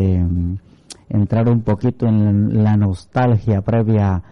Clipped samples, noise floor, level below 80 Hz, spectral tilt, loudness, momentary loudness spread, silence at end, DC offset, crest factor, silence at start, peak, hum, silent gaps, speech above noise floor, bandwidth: under 0.1%; -42 dBFS; -38 dBFS; -9.5 dB/octave; -17 LUFS; 6 LU; 0.1 s; under 0.1%; 8 dB; 0 s; -8 dBFS; none; none; 27 dB; 9.8 kHz